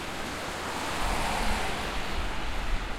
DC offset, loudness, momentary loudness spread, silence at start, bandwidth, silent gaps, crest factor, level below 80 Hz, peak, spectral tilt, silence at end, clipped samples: under 0.1%; -32 LUFS; 5 LU; 0 s; 16.5 kHz; none; 14 dB; -36 dBFS; -16 dBFS; -3.5 dB/octave; 0 s; under 0.1%